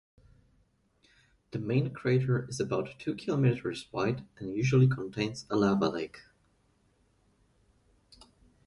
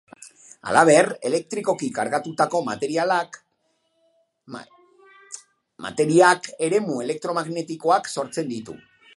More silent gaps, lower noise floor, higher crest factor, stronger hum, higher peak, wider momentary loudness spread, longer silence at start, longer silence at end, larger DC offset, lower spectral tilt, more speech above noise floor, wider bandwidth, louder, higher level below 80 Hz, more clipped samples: neither; about the same, -70 dBFS vs -70 dBFS; about the same, 18 dB vs 22 dB; neither; second, -14 dBFS vs 0 dBFS; second, 12 LU vs 24 LU; first, 1.55 s vs 0.2 s; first, 2.45 s vs 0.4 s; neither; first, -7 dB/octave vs -4.5 dB/octave; second, 40 dB vs 49 dB; about the same, 11.5 kHz vs 11.5 kHz; second, -30 LUFS vs -21 LUFS; first, -62 dBFS vs -68 dBFS; neither